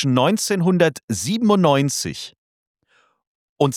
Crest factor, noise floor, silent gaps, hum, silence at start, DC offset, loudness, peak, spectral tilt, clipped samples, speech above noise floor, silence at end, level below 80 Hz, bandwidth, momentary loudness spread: 16 dB; -62 dBFS; 1.03-1.08 s, 2.38-2.75 s, 3.27-3.56 s; none; 0 s; under 0.1%; -19 LUFS; -4 dBFS; -5 dB/octave; under 0.1%; 44 dB; 0 s; -60 dBFS; 16.5 kHz; 11 LU